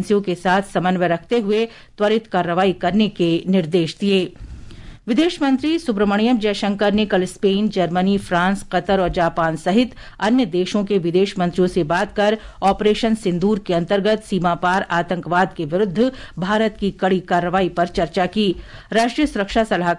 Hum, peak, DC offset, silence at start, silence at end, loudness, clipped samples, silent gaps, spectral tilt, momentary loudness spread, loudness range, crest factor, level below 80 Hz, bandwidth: none; -6 dBFS; under 0.1%; 0 s; 0 s; -19 LUFS; under 0.1%; none; -6 dB/octave; 4 LU; 1 LU; 14 dB; -42 dBFS; 11.5 kHz